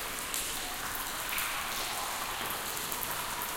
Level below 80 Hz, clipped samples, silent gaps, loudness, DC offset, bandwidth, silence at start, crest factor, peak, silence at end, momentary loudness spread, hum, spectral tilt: -52 dBFS; under 0.1%; none; -33 LUFS; under 0.1%; 17 kHz; 0 s; 26 dB; -10 dBFS; 0 s; 2 LU; none; -0.5 dB/octave